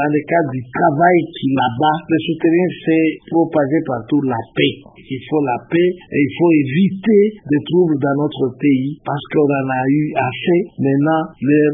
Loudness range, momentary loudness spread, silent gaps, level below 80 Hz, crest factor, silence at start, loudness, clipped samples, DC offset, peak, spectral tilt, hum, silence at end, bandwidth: 2 LU; 6 LU; none; -56 dBFS; 16 dB; 0 s; -16 LUFS; under 0.1%; under 0.1%; 0 dBFS; -12.5 dB/octave; none; 0 s; 3.8 kHz